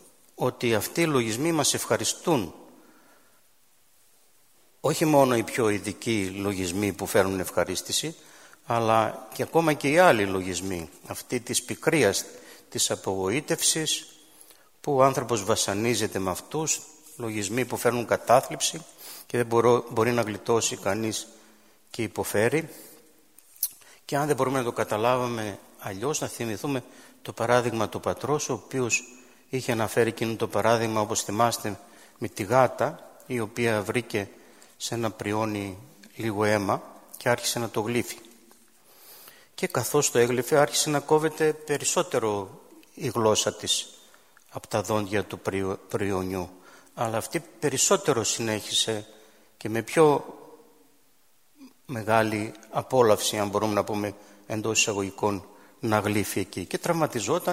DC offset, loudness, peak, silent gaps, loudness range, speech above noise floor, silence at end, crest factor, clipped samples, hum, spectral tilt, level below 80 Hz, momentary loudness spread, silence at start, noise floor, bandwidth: under 0.1%; -26 LUFS; -4 dBFS; none; 5 LU; 39 dB; 0 s; 24 dB; under 0.1%; none; -3.5 dB/octave; -62 dBFS; 13 LU; 0.4 s; -65 dBFS; 16 kHz